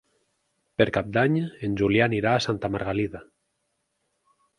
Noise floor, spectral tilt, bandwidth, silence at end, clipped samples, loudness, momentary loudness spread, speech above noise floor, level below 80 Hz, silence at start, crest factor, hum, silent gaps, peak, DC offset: -76 dBFS; -6.5 dB/octave; 11 kHz; 1.35 s; under 0.1%; -24 LUFS; 9 LU; 52 dB; -52 dBFS; 0.8 s; 22 dB; none; none; -4 dBFS; under 0.1%